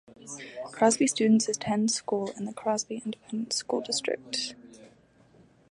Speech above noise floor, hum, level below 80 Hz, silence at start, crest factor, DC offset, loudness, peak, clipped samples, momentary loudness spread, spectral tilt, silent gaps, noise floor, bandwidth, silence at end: 31 dB; none; -72 dBFS; 0.25 s; 20 dB; under 0.1%; -28 LUFS; -8 dBFS; under 0.1%; 15 LU; -3.5 dB/octave; none; -59 dBFS; 11.5 kHz; 0.85 s